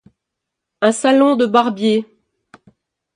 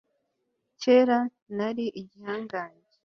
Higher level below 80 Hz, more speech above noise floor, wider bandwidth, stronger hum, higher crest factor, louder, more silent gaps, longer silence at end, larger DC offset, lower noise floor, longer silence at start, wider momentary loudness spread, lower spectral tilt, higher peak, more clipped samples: first, -66 dBFS vs -74 dBFS; first, 66 dB vs 52 dB; first, 11 kHz vs 6.8 kHz; neither; about the same, 18 dB vs 18 dB; first, -15 LUFS vs -27 LUFS; second, none vs 1.42-1.46 s; first, 1.1 s vs 0.35 s; neither; about the same, -80 dBFS vs -78 dBFS; about the same, 0.8 s vs 0.8 s; second, 5 LU vs 16 LU; about the same, -4.5 dB/octave vs -5.5 dB/octave; first, 0 dBFS vs -8 dBFS; neither